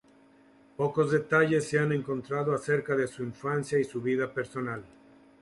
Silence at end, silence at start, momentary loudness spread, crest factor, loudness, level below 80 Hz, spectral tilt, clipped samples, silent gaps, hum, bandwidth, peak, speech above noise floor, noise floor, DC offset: 0.55 s; 0.8 s; 11 LU; 18 dB; -29 LUFS; -66 dBFS; -6.5 dB/octave; under 0.1%; none; none; 11.5 kHz; -12 dBFS; 31 dB; -59 dBFS; under 0.1%